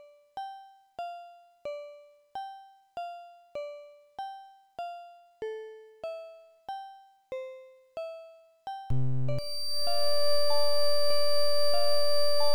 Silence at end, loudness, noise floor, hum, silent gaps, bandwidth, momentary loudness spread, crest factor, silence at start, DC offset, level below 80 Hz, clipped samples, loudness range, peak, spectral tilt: 0 s; -32 LUFS; -52 dBFS; none; none; over 20 kHz; 21 LU; 10 dB; 0 s; under 0.1%; -58 dBFS; under 0.1%; 14 LU; -14 dBFS; -4 dB/octave